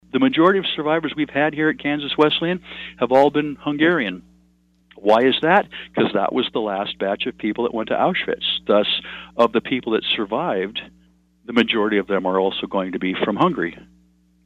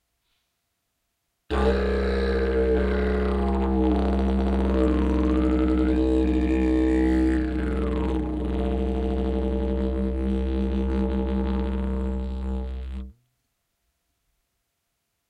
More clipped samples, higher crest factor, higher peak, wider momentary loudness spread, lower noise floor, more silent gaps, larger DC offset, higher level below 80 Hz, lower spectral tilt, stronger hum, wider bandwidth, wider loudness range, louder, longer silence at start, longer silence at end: neither; about the same, 18 dB vs 14 dB; first, -2 dBFS vs -10 dBFS; about the same, 9 LU vs 7 LU; second, -59 dBFS vs -77 dBFS; neither; neither; second, -56 dBFS vs -28 dBFS; second, -6.5 dB/octave vs -9 dB/octave; neither; first, 8 kHz vs 5 kHz; second, 2 LU vs 7 LU; first, -20 LUFS vs -24 LUFS; second, 0.15 s vs 1.5 s; second, 0.65 s vs 2.15 s